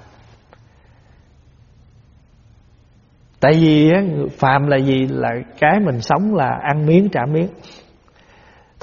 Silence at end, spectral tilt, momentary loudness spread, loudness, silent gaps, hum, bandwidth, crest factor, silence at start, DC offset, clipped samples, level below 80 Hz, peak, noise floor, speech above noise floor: 1.15 s; -6 dB/octave; 9 LU; -16 LUFS; none; none; 7.2 kHz; 18 dB; 3.4 s; under 0.1%; under 0.1%; -50 dBFS; 0 dBFS; -51 dBFS; 36 dB